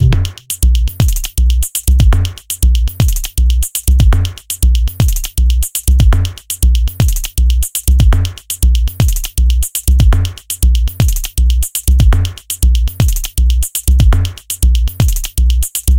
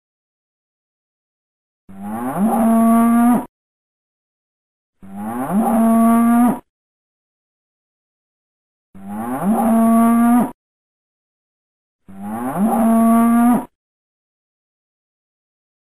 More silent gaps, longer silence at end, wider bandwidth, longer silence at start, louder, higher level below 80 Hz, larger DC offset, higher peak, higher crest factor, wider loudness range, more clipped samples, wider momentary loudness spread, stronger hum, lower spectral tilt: second, none vs 3.49-4.93 s, 6.69-8.93 s, 10.54-11.99 s; second, 0 s vs 2.2 s; first, 17.5 kHz vs 13.5 kHz; second, 0 s vs 1.9 s; about the same, -14 LUFS vs -15 LUFS; first, -12 dBFS vs -52 dBFS; second, under 0.1% vs 1%; first, 0 dBFS vs -6 dBFS; about the same, 10 dB vs 12 dB; about the same, 1 LU vs 2 LU; neither; second, 5 LU vs 15 LU; neither; second, -4.5 dB/octave vs -7 dB/octave